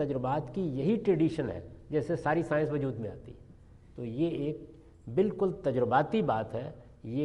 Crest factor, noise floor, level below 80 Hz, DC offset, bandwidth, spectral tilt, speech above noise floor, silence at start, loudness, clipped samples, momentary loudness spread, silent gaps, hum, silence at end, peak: 18 dB; -54 dBFS; -56 dBFS; under 0.1%; 10.5 kHz; -8.5 dB/octave; 24 dB; 0 s; -31 LUFS; under 0.1%; 16 LU; none; none; 0 s; -12 dBFS